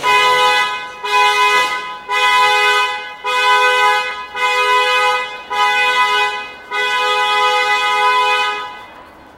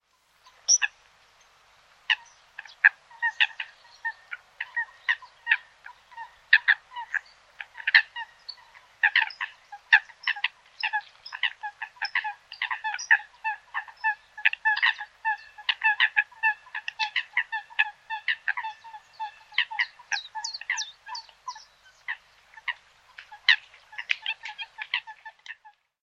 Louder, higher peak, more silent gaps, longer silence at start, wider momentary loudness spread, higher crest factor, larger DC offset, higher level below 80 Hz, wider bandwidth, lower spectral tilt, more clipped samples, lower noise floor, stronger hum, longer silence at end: first, -14 LUFS vs -26 LUFS; about the same, 0 dBFS vs -2 dBFS; neither; second, 0 s vs 0.7 s; second, 10 LU vs 21 LU; second, 14 dB vs 28 dB; neither; first, -56 dBFS vs -78 dBFS; first, 16 kHz vs 8.4 kHz; first, 0.5 dB/octave vs 5.5 dB/octave; neither; second, -38 dBFS vs -61 dBFS; neither; about the same, 0.3 s vs 0.35 s